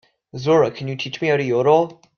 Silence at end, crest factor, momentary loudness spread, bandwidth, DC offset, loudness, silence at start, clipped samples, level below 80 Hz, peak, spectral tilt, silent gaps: 0.25 s; 16 dB; 11 LU; 6.8 kHz; under 0.1%; -19 LUFS; 0.35 s; under 0.1%; -62 dBFS; -4 dBFS; -6.5 dB/octave; none